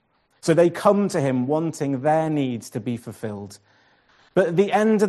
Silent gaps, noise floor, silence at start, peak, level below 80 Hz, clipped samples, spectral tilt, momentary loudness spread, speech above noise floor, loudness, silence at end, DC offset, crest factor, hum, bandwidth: none; -58 dBFS; 0.45 s; -4 dBFS; -66 dBFS; under 0.1%; -6.5 dB/octave; 14 LU; 37 dB; -22 LUFS; 0 s; under 0.1%; 18 dB; none; 12.5 kHz